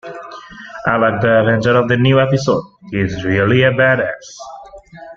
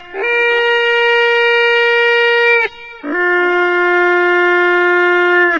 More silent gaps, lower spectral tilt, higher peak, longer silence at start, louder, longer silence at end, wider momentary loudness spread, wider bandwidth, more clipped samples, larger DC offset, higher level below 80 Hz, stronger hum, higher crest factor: neither; first, -6.5 dB/octave vs -2.5 dB/octave; about the same, 0 dBFS vs -2 dBFS; about the same, 0.05 s vs 0 s; second, -14 LUFS vs -11 LUFS; about the same, 0.05 s vs 0 s; first, 20 LU vs 4 LU; about the same, 7.4 kHz vs 7.4 kHz; neither; neither; first, -46 dBFS vs -54 dBFS; neither; about the same, 14 dB vs 10 dB